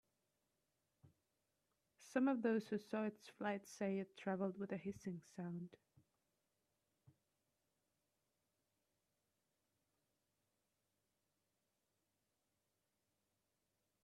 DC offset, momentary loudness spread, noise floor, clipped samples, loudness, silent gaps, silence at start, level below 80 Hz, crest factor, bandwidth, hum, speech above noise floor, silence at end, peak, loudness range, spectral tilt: under 0.1%; 12 LU; -89 dBFS; under 0.1%; -44 LUFS; none; 1.05 s; -90 dBFS; 22 dB; 13 kHz; none; 45 dB; 8.3 s; -26 dBFS; 13 LU; -6.5 dB/octave